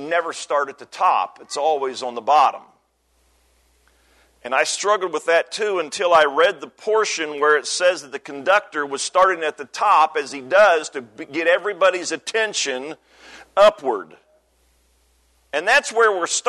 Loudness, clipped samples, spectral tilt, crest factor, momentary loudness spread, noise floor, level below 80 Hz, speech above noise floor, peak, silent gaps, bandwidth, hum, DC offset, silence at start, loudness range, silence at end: -19 LUFS; under 0.1%; -1 dB/octave; 16 dB; 12 LU; -64 dBFS; -64 dBFS; 44 dB; -4 dBFS; none; 12.5 kHz; none; under 0.1%; 0 s; 4 LU; 0 s